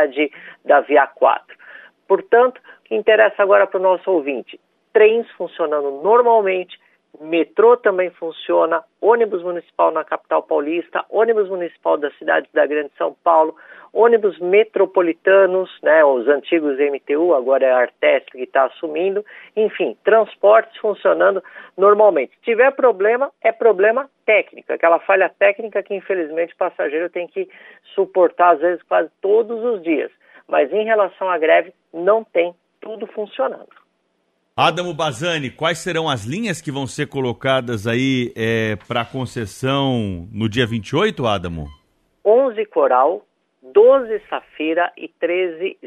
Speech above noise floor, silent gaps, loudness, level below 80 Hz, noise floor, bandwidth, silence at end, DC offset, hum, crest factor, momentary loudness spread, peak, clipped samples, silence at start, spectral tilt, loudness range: 50 dB; none; -17 LUFS; -56 dBFS; -67 dBFS; 12 kHz; 0 s; under 0.1%; none; 16 dB; 11 LU; -2 dBFS; under 0.1%; 0 s; -5.5 dB/octave; 5 LU